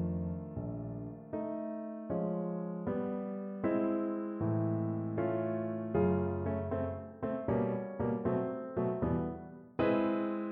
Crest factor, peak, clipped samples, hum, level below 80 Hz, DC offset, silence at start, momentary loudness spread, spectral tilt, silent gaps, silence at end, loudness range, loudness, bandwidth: 16 dB; -18 dBFS; under 0.1%; none; -58 dBFS; under 0.1%; 0 s; 9 LU; -12 dB/octave; none; 0 s; 4 LU; -35 LUFS; 4.3 kHz